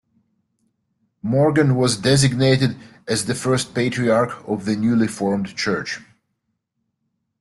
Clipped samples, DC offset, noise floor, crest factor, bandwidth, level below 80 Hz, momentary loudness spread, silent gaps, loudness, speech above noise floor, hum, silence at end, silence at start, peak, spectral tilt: under 0.1%; under 0.1%; -75 dBFS; 18 dB; 12 kHz; -52 dBFS; 9 LU; none; -19 LUFS; 56 dB; none; 1.35 s; 1.25 s; -4 dBFS; -5.5 dB/octave